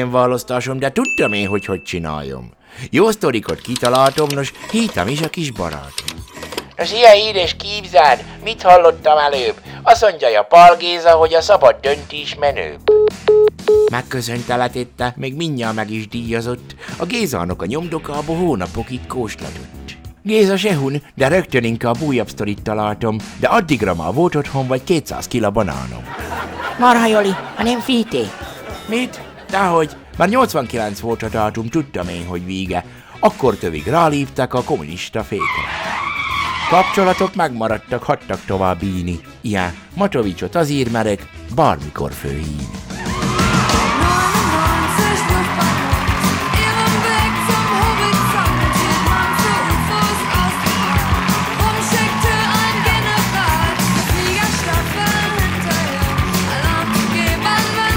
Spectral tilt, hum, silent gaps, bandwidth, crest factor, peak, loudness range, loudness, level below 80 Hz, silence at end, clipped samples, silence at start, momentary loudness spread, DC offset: -4.5 dB/octave; none; none; over 20 kHz; 16 dB; 0 dBFS; 8 LU; -16 LUFS; -32 dBFS; 0 s; 0.2%; 0 s; 12 LU; under 0.1%